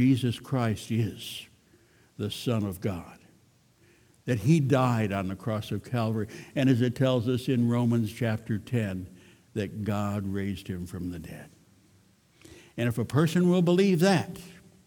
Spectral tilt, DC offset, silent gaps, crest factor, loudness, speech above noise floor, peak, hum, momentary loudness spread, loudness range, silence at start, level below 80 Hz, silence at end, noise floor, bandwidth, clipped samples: -7 dB/octave; under 0.1%; none; 20 dB; -28 LUFS; 35 dB; -8 dBFS; none; 15 LU; 8 LU; 0 s; -60 dBFS; 0.3 s; -62 dBFS; 18 kHz; under 0.1%